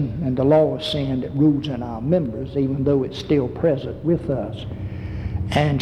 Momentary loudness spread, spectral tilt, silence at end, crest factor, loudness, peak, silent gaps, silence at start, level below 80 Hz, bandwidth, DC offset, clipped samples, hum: 12 LU; -8 dB/octave; 0 s; 16 dB; -22 LUFS; -6 dBFS; none; 0 s; -40 dBFS; 11.5 kHz; under 0.1%; under 0.1%; none